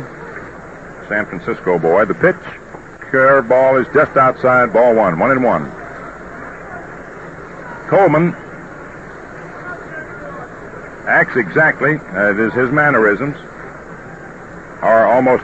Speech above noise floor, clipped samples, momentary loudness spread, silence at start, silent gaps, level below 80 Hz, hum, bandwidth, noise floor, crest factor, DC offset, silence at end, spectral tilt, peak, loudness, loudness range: 20 dB; under 0.1%; 21 LU; 0 s; none; -46 dBFS; none; 8.2 kHz; -33 dBFS; 16 dB; 0.3%; 0 s; -8 dB/octave; 0 dBFS; -13 LUFS; 7 LU